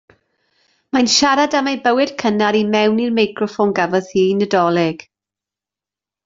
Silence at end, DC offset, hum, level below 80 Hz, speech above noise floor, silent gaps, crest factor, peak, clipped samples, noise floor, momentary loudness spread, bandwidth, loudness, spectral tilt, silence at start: 1.3 s; under 0.1%; none; -58 dBFS; 73 dB; none; 16 dB; -2 dBFS; under 0.1%; -89 dBFS; 6 LU; 7.8 kHz; -16 LUFS; -4 dB/octave; 0.95 s